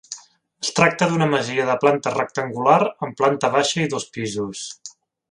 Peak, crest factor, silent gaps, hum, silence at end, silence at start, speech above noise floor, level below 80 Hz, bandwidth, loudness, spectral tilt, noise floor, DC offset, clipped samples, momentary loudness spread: 0 dBFS; 20 dB; none; none; 0.4 s; 0.1 s; 26 dB; -64 dBFS; 11.5 kHz; -20 LUFS; -4.5 dB/octave; -45 dBFS; under 0.1%; under 0.1%; 15 LU